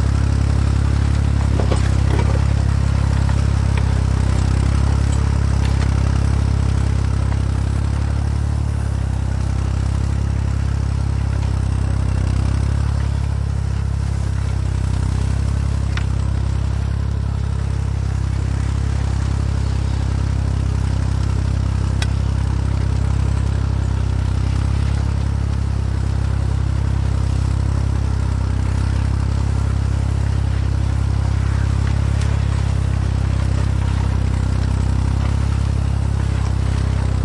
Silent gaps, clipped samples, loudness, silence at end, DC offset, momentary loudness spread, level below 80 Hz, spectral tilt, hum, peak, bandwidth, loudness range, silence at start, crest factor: none; under 0.1%; -20 LUFS; 0 s; under 0.1%; 3 LU; -20 dBFS; -7 dB/octave; none; -2 dBFS; 11 kHz; 3 LU; 0 s; 14 dB